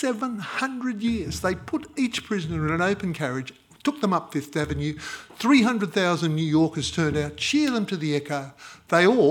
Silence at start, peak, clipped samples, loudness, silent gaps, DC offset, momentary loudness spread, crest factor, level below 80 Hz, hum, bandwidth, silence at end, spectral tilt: 0 s; -4 dBFS; under 0.1%; -25 LUFS; none; under 0.1%; 11 LU; 20 dB; -52 dBFS; none; 17.5 kHz; 0 s; -5.5 dB/octave